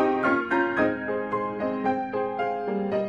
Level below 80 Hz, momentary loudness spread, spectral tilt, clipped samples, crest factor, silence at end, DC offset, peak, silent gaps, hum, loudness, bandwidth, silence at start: -62 dBFS; 6 LU; -7.5 dB/octave; under 0.1%; 14 dB; 0 s; under 0.1%; -10 dBFS; none; none; -26 LUFS; 7.4 kHz; 0 s